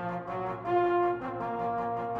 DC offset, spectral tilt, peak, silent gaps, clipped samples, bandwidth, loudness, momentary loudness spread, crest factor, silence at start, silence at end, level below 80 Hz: under 0.1%; -8.5 dB/octave; -18 dBFS; none; under 0.1%; 5.2 kHz; -31 LUFS; 8 LU; 12 dB; 0 s; 0 s; -62 dBFS